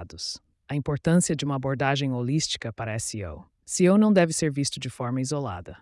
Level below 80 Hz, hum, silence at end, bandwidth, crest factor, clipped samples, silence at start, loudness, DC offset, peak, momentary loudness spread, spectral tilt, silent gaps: -54 dBFS; none; 0.05 s; 12 kHz; 16 dB; under 0.1%; 0 s; -25 LUFS; under 0.1%; -8 dBFS; 14 LU; -5 dB/octave; none